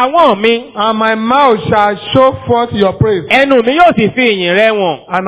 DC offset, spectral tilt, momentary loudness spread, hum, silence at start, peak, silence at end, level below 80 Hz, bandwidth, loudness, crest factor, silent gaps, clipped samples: under 0.1%; -9.5 dB/octave; 5 LU; none; 0 s; 0 dBFS; 0 s; -40 dBFS; 4 kHz; -10 LUFS; 10 dB; none; 1%